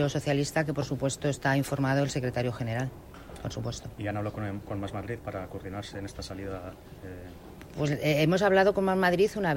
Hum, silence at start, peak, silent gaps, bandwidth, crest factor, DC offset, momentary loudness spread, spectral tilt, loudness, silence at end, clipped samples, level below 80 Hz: none; 0 s; -12 dBFS; none; 16 kHz; 18 dB; under 0.1%; 19 LU; -6 dB/octave; -29 LUFS; 0 s; under 0.1%; -52 dBFS